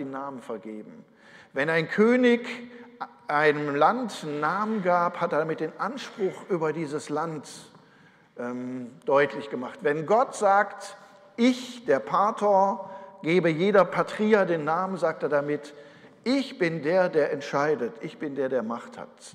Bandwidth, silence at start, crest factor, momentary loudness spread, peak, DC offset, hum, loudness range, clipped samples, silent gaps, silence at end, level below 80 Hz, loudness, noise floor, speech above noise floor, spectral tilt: 12 kHz; 0 s; 18 dB; 15 LU; -8 dBFS; under 0.1%; none; 6 LU; under 0.1%; none; 0.05 s; -76 dBFS; -26 LUFS; -57 dBFS; 31 dB; -6 dB/octave